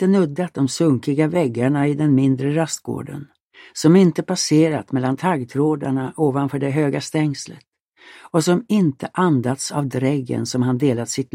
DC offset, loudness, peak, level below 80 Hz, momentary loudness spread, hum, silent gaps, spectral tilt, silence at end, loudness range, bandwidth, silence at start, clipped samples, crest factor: under 0.1%; -19 LUFS; -4 dBFS; -62 dBFS; 7 LU; none; 3.40-3.48 s, 7.80-7.92 s; -6 dB/octave; 0.1 s; 3 LU; 16 kHz; 0 s; under 0.1%; 16 dB